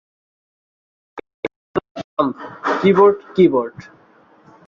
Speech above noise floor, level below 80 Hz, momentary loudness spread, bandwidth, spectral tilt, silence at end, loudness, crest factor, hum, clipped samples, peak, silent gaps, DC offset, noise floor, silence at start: 36 dB; -58 dBFS; 19 LU; 7 kHz; -8 dB/octave; 0.85 s; -17 LUFS; 18 dB; none; under 0.1%; -2 dBFS; 1.34-1.43 s, 1.56-1.74 s, 1.91-1.95 s, 2.04-2.17 s; under 0.1%; -51 dBFS; 1.15 s